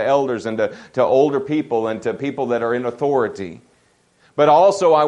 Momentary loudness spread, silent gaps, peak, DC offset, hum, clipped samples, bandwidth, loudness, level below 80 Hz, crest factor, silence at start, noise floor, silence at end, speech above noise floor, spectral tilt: 11 LU; none; -2 dBFS; under 0.1%; none; under 0.1%; 10.5 kHz; -18 LUFS; -64 dBFS; 16 dB; 0 s; -58 dBFS; 0 s; 41 dB; -6 dB/octave